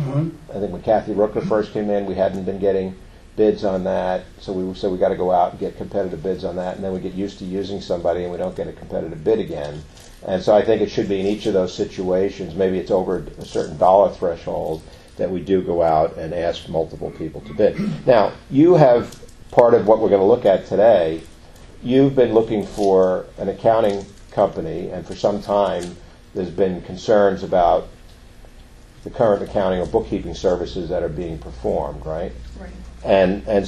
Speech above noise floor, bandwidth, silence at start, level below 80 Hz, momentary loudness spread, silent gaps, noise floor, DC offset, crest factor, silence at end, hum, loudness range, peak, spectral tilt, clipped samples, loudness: 24 dB; 12 kHz; 0 s; -42 dBFS; 14 LU; none; -43 dBFS; under 0.1%; 20 dB; 0 s; none; 7 LU; 0 dBFS; -7 dB/octave; under 0.1%; -20 LUFS